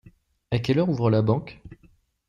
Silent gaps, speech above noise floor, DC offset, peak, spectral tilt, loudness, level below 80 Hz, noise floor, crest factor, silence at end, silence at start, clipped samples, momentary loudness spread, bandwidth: none; 37 dB; under 0.1%; -10 dBFS; -8.5 dB/octave; -24 LUFS; -54 dBFS; -59 dBFS; 16 dB; 0.55 s; 0.5 s; under 0.1%; 8 LU; 7.4 kHz